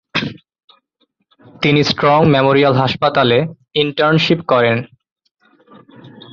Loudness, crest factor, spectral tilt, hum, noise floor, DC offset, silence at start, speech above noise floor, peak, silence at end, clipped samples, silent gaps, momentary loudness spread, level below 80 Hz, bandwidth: -14 LUFS; 14 dB; -6.5 dB/octave; none; -65 dBFS; under 0.1%; 0.15 s; 52 dB; -2 dBFS; 0.25 s; under 0.1%; 0.64-0.68 s, 5.12-5.16 s, 5.31-5.35 s; 9 LU; -50 dBFS; 7.2 kHz